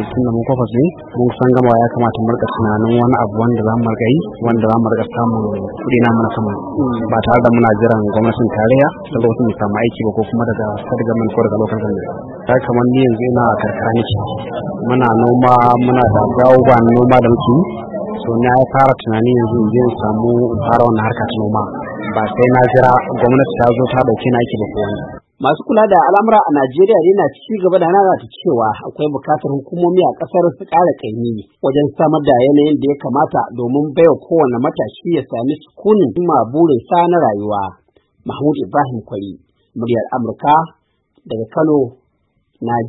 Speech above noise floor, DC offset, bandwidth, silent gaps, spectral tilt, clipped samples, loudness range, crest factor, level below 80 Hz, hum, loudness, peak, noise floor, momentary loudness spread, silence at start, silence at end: 49 dB; under 0.1%; 4.9 kHz; none; -10 dB/octave; under 0.1%; 5 LU; 14 dB; -44 dBFS; none; -14 LUFS; 0 dBFS; -62 dBFS; 10 LU; 0 s; 0 s